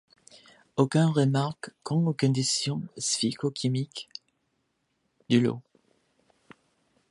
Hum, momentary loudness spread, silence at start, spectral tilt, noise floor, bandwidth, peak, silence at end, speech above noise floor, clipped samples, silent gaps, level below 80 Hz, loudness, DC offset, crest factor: none; 15 LU; 0.75 s; -5 dB/octave; -76 dBFS; 11.5 kHz; -8 dBFS; 1.5 s; 50 dB; under 0.1%; none; -70 dBFS; -27 LUFS; under 0.1%; 20 dB